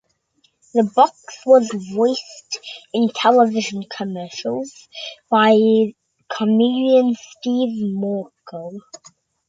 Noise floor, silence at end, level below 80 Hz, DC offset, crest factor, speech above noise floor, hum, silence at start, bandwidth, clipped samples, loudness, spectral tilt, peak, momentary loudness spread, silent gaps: -63 dBFS; 0.55 s; -70 dBFS; under 0.1%; 18 dB; 45 dB; none; 0.75 s; 7.8 kHz; under 0.1%; -18 LUFS; -5 dB/octave; 0 dBFS; 18 LU; none